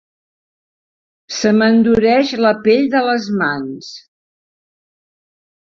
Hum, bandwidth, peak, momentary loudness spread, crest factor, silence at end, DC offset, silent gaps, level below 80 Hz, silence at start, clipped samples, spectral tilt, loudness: none; 7.4 kHz; -2 dBFS; 15 LU; 16 dB; 1.7 s; under 0.1%; none; -52 dBFS; 1.3 s; under 0.1%; -5 dB/octave; -14 LUFS